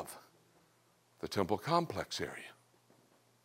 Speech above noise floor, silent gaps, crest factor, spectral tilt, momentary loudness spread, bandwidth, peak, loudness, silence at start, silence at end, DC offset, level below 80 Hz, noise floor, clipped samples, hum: 34 dB; none; 24 dB; -5 dB/octave; 18 LU; 16 kHz; -16 dBFS; -37 LUFS; 0 s; 0.9 s; under 0.1%; -72 dBFS; -71 dBFS; under 0.1%; none